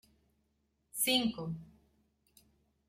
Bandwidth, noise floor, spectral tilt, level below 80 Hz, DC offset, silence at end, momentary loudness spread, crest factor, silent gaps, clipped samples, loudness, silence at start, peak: 16.5 kHz; -78 dBFS; -2.5 dB/octave; -70 dBFS; under 0.1%; 1.25 s; 16 LU; 22 dB; none; under 0.1%; -32 LUFS; 0.95 s; -16 dBFS